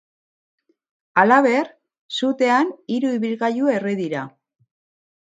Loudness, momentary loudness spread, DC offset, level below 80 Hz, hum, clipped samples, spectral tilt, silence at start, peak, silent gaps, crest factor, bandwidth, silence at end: -20 LUFS; 14 LU; under 0.1%; -74 dBFS; none; under 0.1%; -5.5 dB/octave; 1.15 s; 0 dBFS; 2.01-2.09 s; 22 dB; 9.2 kHz; 0.95 s